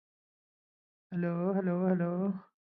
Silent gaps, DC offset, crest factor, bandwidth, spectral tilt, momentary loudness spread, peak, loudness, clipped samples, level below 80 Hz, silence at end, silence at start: none; under 0.1%; 18 dB; 2.9 kHz; -13 dB/octave; 6 LU; -16 dBFS; -32 LUFS; under 0.1%; -80 dBFS; 0.3 s; 1.1 s